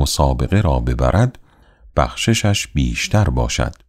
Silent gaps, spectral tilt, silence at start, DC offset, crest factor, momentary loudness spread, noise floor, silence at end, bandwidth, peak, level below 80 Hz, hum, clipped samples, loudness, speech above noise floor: none; -5 dB/octave; 0 s; under 0.1%; 16 dB; 4 LU; -48 dBFS; 0.15 s; 15.5 kHz; -2 dBFS; -24 dBFS; none; under 0.1%; -18 LUFS; 31 dB